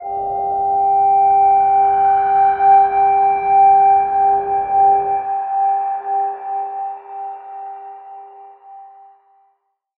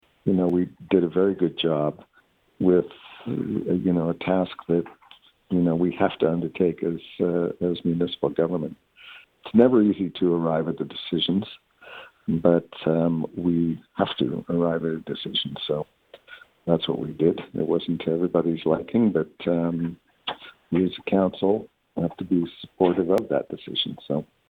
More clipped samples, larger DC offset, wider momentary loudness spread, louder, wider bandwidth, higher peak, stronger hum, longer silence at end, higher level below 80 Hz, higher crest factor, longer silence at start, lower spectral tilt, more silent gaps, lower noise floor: neither; neither; first, 18 LU vs 11 LU; first, -14 LUFS vs -24 LUFS; second, 3.1 kHz vs 4.8 kHz; about the same, -4 dBFS vs -4 dBFS; neither; first, 1.1 s vs 0.25 s; about the same, -54 dBFS vs -58 dBFS; second, 12 dB vs 22 dB; second, 0 s vs 0.25 s; about the same, -9 dB/octave vs -9 dB/octave; neither; about the same, -65 dBFS vs -62 dBFS